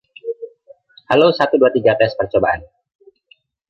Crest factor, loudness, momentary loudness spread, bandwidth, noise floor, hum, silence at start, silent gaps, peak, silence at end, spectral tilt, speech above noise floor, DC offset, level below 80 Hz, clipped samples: 16 dB; -15 LUFS; 16 LU; 6.6 kHz; -55 dBFS; none; 0.25 s; none; -2 dBFS; 1.05 s; -7 dB/octave; 41 dB; under 0.1%; -50 dBFS; under 0.1%